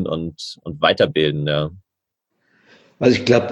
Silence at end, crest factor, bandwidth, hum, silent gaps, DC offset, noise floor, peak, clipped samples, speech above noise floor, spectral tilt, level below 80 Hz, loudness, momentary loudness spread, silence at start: 0 s; 20 dB; 10.5 kHz; none; none; under 0.1%; -80 dBFS; 0 dBFS; under 0.1%; 62 dB; -6 dB/octave; -50 dBFS; -19 LUFS; 13 LU; 0 s